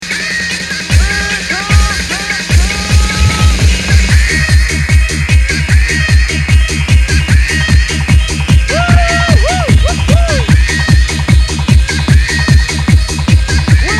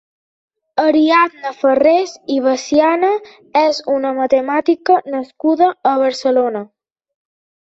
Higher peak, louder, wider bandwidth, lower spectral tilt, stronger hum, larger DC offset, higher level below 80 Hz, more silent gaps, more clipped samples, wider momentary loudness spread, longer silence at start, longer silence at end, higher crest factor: about the same, 0 dBFS vs -2 dBFS; first, -10 LUFS vs -15 LUFS; first, 13 kHz vs 8 kHz; about the same, -4.5 dB/octave vs -3.5 dB/octave; neither; first, 0.3% vs under 0.1%; first, -12 dBFS vs -62 dBFS; neither; first, 0.1% vs under 0.1%; second, 3 LU vs 7 LU; second, 0 s vs 0.75 s; second, 0 s vs 1 s; second, 8 dB vs 14 dB